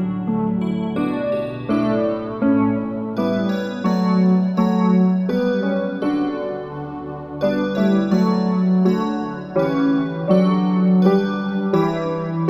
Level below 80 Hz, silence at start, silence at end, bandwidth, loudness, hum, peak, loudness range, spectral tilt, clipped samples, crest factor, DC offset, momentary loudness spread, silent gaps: -54 dBFS; 0 s; 0 s; 7.6 kHz; -19 LUFS; none; -4 dBFS; 3 LU; -9 dB/octave; under 0.1%; 16 dB; under 0.1%; 7 LU; none